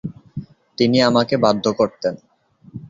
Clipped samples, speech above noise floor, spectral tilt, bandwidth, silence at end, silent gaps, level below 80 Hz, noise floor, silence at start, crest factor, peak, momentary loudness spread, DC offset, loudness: under 0.1%; 22 dB; -6 dB/octave; 7.6 kHz; 0 s; none; -54 dBFS; -39 dBFS; 0.05 s; 18 dB; -2 dBFS; 22 LU; under 0.1%; -18 LUFS